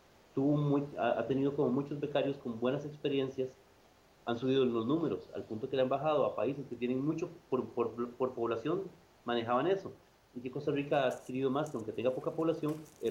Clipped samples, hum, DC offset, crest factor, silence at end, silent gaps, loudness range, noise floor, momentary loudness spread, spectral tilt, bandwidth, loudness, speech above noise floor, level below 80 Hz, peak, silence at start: under 0.1%; none; under 0.1%; 16 dB; 0 s; none; 2 LU; -64 dBFS; 9 LU; -7.5 dB/octave; 15 kHz; -34 LUFS; 30 dB; -72 dBFS; -18 dBFS; 0.35 s